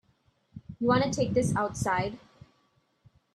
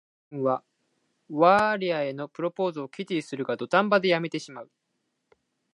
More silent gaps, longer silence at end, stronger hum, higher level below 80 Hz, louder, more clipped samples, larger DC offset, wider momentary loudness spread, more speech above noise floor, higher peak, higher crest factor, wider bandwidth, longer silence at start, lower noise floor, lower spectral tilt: neither; about the same, 1.15 s vs 1.1 s; neither; first, -56 dBFS vs -72 dBFS; about the same, -28 LUFS vs -26 LUFS; neither; neither; first, 22 LU vs 15 LU; second, 43 dB vs 52 dB; second, -12 dBFS vs -6 dBFS; about the same, 18 dB vs 20 dB; first, 13 kHz vs 11.5 kHz; first, 0.55 s vs 0.3 s; second, -70 dBFS vs -78 dBFS; about the same, -5.5 dB/octave vs -6 dB/octave